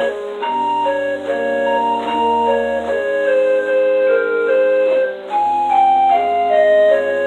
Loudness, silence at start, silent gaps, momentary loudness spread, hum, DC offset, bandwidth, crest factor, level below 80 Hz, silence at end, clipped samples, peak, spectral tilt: -15 LUFS; 0 s; none; 7 LU; none; under 0.1%; 8.8 kHz; 12 dB; -56 dBFS; 0 s; under 0.1%; -4 dBFS; -4.5 dB/octave